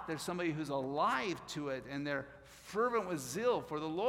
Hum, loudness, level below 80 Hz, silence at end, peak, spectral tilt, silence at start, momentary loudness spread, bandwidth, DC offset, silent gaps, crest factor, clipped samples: none; -37 LUFS; -68 dBFS; 0 s; -20 dBFS; -4.5 dB/octave; 0 s; 8 LU; 16.5 kHz; under 0.1%; none; 16 dB; under 0.1%